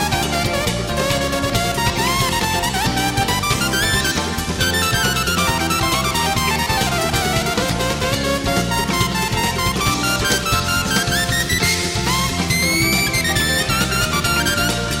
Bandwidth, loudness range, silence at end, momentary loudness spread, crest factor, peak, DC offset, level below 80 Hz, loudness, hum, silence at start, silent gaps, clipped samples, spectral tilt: 16.5 kHz; 2 LU; 0 s; 3 LU; 16 dB; -4 dBFS; under 0.1%; -32 dBFS; -17 LUFS; none; 0 s; none; under 0.1%; -3 dB/octave